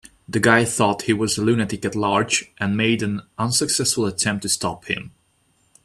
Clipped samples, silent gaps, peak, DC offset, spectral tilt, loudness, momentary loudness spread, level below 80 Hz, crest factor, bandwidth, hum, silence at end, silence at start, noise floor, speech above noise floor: under 0.1%; none; 0 dBFS; under 0.1%; -3.5 dB/octave; -20 LUFS; 9 LU; -54 dBFS; 22 dB; 15 kHz; none; 0.75 s; 0.3 s; -63 dBFS; 42 dB